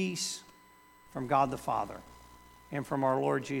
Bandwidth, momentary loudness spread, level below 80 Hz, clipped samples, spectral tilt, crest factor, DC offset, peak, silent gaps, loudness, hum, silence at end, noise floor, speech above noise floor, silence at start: 19 kHz; 13 LU; -62 dBFS; under 0.1%; -4.5 dB/octave; 20 dB; under 0.1%; -14 dBFS; none; -32 LUFS; none; 0 s; -59 dBFS; 28 dB; 0 s